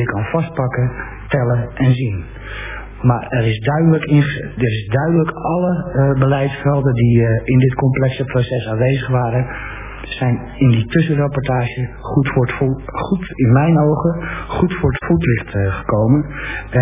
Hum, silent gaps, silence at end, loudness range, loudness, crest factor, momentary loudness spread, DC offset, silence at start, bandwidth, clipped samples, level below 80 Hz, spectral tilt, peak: none; none; 0 s; 3 LU; -17 LUFS; 14 dB; 10 LU; under 0.1%; 0 s; 3.8 kHz; under 0.1%; -34 dBFS; -12 dB/octave; 0 dBFS